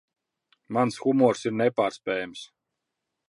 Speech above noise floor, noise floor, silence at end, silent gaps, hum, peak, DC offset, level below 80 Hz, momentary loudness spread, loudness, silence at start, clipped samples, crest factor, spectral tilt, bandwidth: 59 dB; -83 dBFS; 0.85 s; none; none; -8 dBFS; under 0.1%; -72 dBFS; 10 LU; -25 LUFS; 0.7 s; under 0.1%; 20 dB; -6 dB/octave; 11.5 kHz